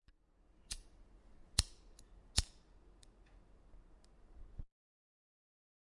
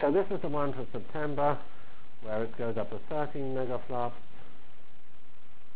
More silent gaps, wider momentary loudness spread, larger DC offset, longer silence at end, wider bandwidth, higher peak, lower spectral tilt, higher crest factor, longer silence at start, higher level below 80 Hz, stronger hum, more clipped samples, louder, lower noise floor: neither; first, 26 LU vs 10 LU; second, under 0.1% vs 4%; first, 1.3 s vs 0.5 s; first, 11.5 kHz vs 4 kHz; about the same, -12 dBFS vs -14 dBFS; second, -2 dB/octave vs -10 dB/octave; first, 36 dB vs 20 dB; first, 0.7 s vs 0 s; first, -52 dBFS vs -60 dBFS; neither; neither; second, -41 LUFS vs -34 LUFS; first, -69 dBFS vs -61 dBFS